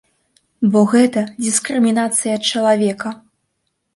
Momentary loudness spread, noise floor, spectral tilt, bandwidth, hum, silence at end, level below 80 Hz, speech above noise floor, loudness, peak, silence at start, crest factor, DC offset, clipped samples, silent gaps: 8 LU; -71 dBFS; -4 dB/octave; 11.5 kHz; none; 0.8 s; -64 dBFS; 56 dB; -16 LUFS; -2 dBFS; 0.6 s; 16 dB; under 0.1%; under 0.1%; none